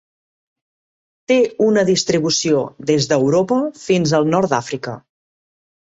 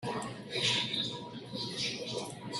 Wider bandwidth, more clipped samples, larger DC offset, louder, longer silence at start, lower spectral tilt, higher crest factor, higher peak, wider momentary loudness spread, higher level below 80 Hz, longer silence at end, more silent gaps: second, 8 kHz vs 12.5 kHz; neither; neither; first, -17 LUFS vs -34 LUFS; first, 1.3 s vs 0 s; first, -4.5 dB/octave vs -3 dB/octave; about the same, 16 dB vs 20 dB; first, -2 dBFS vs -18 dBFS; second, 6 LU vs 10 LU; first, -58 dBFS vs -70 dBFS; first, 0.85 s vs 0 s; neither